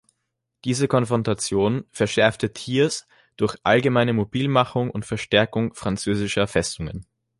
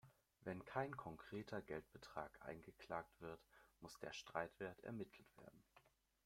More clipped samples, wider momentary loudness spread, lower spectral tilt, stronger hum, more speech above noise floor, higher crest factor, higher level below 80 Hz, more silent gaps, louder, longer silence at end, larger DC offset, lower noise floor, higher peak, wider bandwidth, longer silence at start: neither; second, 9 LU vs 14 LU; about the same, -5 dB/octave vs -5.5 dB/octave; neither; first, 57 dB vs 23 dB; second, 20 dB vs 26 dB; first, -48 dBFS vs -78 dBFS; neither; first, -22 LUFS vs -53 LUFS; about the same, 0.35 s vs 0.4 s; neither; about the same, -78 dBFS vs -76 dBFS; first, -2 dBFS vs -28 dBFS; second, 11.5 kHz vs 16.5 kHz; first, 0.65 s vs 0.05 s